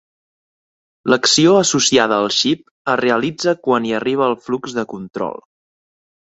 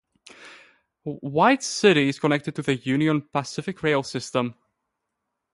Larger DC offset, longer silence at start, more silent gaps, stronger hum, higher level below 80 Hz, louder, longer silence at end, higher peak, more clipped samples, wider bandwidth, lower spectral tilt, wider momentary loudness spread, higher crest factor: neither; first, 1.05 s vs 0.4 s; first, 2.71-2.85 s vs none; neither; first, -58 dBFS vs -64 dBFS; first, -16 LUFS vs -23 LUFS; about the same, 0.95 s vs 1 s; about the same, -2 dBFS vs -4 dBFS; neither; second, 8.2 kHz vs 11.5 kHz; second, -3 dB/octave vs -5 dB/octave; about the same, 13 LU vs 13 LU; about the same, 16 dB vs 20 dB